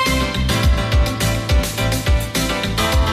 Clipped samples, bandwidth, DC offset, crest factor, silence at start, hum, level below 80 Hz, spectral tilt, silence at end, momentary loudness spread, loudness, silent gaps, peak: under 0.1%; 16 kHz; under 0.1%; 10 dB; 0 s; none; -20 dBFS; -4.5 dB/octave; 0 s; 2 LU; -18 LUFS; none; -8 dBFS